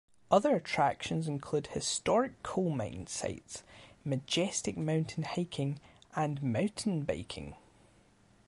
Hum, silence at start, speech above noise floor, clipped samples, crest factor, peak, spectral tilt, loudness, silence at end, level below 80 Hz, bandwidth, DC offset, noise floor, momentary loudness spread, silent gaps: none; 0.3 s; 31 dB; under 0.1%; 22 dB; -12 dBFS; -5 dB/octave; -33 LUFS; 0.95 s; -60 dBFS; 11.5 kHz; under 0.1%; -64 dBFS; 14 LU; none